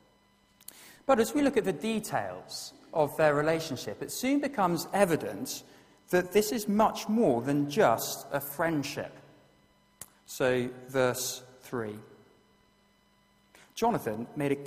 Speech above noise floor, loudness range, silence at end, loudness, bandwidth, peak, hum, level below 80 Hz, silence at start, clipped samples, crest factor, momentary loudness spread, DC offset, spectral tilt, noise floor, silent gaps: 37 dB; 6 LU; 0 s; -30 LUFS; 15.5 kHz; -8 dBFS; none; -64 dBFS; 0.75 s; under 0.1%; 22 dB; 15 LU; under 0.1%; -4.5 dB/octave; -66 dBFS; none